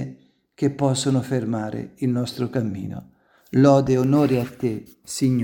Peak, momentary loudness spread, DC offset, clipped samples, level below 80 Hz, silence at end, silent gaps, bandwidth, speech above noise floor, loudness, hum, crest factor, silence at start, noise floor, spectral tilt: -2 dBFS; 16 LU; under 0.1%; under 0.1%; -56 dBFS; 0 s; none; 18 kHz; 27 dB; -22 LUFS; none; 18 dB; 0 s; -48 dBFS; -6.5 dB/octave